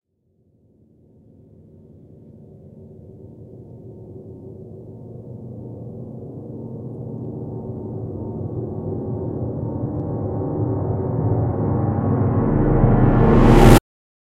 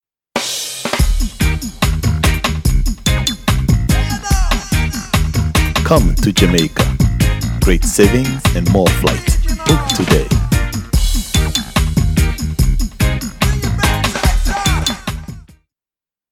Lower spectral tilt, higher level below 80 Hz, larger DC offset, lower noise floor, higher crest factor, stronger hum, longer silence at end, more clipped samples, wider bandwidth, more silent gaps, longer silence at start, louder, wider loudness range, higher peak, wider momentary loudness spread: first, -8 dB/octave vs -4.5 dB/octave; second, -28 dBFS vs -18 dBFS; neither; second, -63 dBFS vs under -90 dBFS; first, 20 dB vs 14 dB; neither; second, 0.55 s vs 0.9 s; neither; about the same, 16 kHz vs 17 kHz; neither; first, 2.35 s vs 0.35 s; second, -20 LUFS vs -15 LUFS; first, 25 LU vs 3 LU; about the same, 0 dBFS vs 0 dBFS; first, 25 LU vs 5 LU